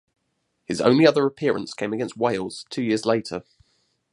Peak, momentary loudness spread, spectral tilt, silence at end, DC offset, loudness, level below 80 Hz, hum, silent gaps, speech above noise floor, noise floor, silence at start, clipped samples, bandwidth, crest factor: -2 dBFS; 14 LU; -5.5 dB/octave; 0.7 s; under 0.1%; -22 LUFS; -64 dBFS; none; none; 52 dB; -74 dBFS; 0.7 s; under 0.1%; 11.5 kHz; 22 dB